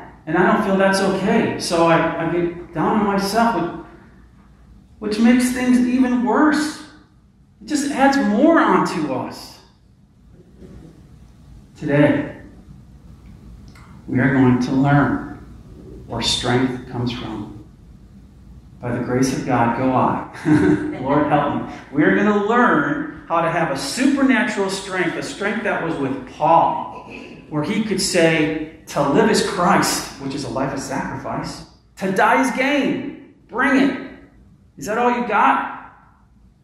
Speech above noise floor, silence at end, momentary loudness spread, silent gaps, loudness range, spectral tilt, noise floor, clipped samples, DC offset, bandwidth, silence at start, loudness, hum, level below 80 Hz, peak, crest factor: 34 dB; 0.75 s; 14 LU; none; 7 LU; -5 dB/octave; -51 dBFS; under 0.1%; under 0.1%; 15.5 kHz; 0 s; -18 LUFS; none; -46 dBFS; -2 dBFS; 18 dB